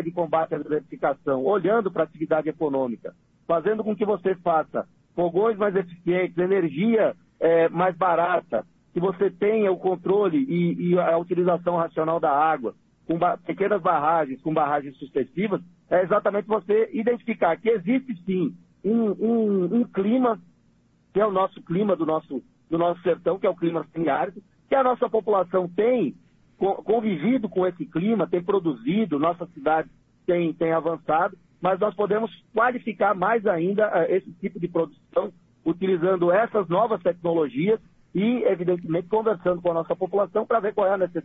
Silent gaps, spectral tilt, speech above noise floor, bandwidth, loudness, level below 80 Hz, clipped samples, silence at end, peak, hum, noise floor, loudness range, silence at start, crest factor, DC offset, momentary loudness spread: none; -10 dB/octave; 38 dB; 3.9 kHz; -24 LUFS; -64 dBFS; under 0.1%; 0.05 s; -8 dBFS; none; -61 dBFS; 2 LU; 0 s; 16 dB; under 0.1%; 7 LU